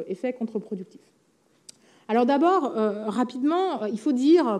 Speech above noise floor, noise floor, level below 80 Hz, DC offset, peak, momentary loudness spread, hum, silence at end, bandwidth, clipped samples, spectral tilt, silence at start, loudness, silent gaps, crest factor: 30 dB; -54 dBFS; -86 dBFS; under 0.1%; -10 dBFS; 13 LU; none; 0 s; 10.5 kHz; under 0.1%; -6.5 dB/octave; 0 s; -24 LUFS; none; 16 dB